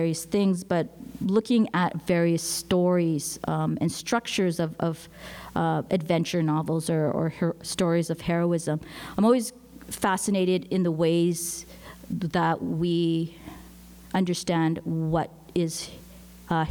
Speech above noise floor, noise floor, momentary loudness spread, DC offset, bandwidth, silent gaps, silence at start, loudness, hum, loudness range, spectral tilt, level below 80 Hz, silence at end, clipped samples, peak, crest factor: 22 dB; -47 dBFS; 12 LU; under 0.1%; 19 kHz; none; 0 s; -26 LUFS; none; 3 LU; -5.5 dB/octave; -54 dBFS; 0 s; under 0.1%; -8 dBFS; 16 dB